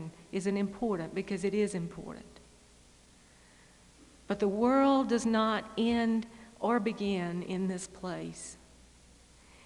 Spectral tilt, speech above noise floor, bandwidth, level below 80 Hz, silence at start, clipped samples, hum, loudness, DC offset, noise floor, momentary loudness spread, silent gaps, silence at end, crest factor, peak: -5.5 dB/octave; 29 dB; 11.5 kHz; -62 dBFS; 0 s; under 0.1%; 60 Hz at -55 dBFS; -32 LUFS; under 0.1%; -60 dBFS; 15 LU; none; 1.1 s; 18 dB; -14 dBFS